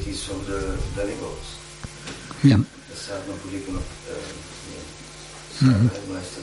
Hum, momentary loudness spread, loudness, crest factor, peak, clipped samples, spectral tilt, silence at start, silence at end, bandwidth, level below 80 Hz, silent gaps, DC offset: none; 19 LU; -25 LUFS; 22 dB; -4 dBFS; under 0.1%; -6 dB/octave; 0 s; 0 s; 11.5 kHz; -40 dBFS; none; under 0.1%